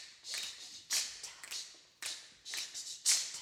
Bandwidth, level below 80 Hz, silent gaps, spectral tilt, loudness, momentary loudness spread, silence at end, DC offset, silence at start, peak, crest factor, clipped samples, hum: 18 kHz; -84 dBFS; none; 3.5 dB/octave; -37 LUFS; 16 LU; 0 s; under 0.1%; 0 s; -16 dBFS; 24 dB; under 0.1%; none